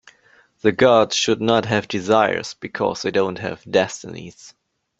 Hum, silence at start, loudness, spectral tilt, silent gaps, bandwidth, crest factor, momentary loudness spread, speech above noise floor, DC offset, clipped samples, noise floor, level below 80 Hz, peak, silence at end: none; 0.65 s; -19 LUFS; -4 dB/octave; none; 8.2 kHz; 20 dB; 15 LU; 36 dB; under 0.1%; under 0.1%; -56 dBFS; -58 dBFS; -2 dBFS; 0.5 s